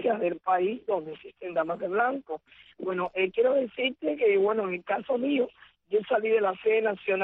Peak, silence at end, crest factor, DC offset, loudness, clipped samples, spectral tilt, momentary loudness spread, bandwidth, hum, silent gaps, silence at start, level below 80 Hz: -14 dBFS; 0 s; 14 dB; under 0.1%; -27 LUFS; under 0.1%; -8 dB/octave; 9 LU; 4 kHz; none; none; 0 s; -70 dBFS